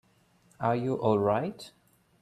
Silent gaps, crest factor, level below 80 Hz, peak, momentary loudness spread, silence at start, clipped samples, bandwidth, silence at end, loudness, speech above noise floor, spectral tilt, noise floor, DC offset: none; 20 dB; -68 dBFS; -10 dBFS; 18 LU; 0.6 s; under 0.1%; 13 kHz; 0.55 s; -29 LUFS; 37 dB; -8 dB/octave; -65 dBFS; under 0.1%